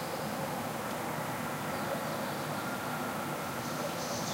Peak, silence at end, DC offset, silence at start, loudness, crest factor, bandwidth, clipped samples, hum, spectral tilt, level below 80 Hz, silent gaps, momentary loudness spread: -22 dBFS; 0 s; under 0.1%; 0 s; -36 LUFS; 14 dB; 16 kHz; under 0.1%; none; -4 dB/octave; -66 dBFS; none; 1 LU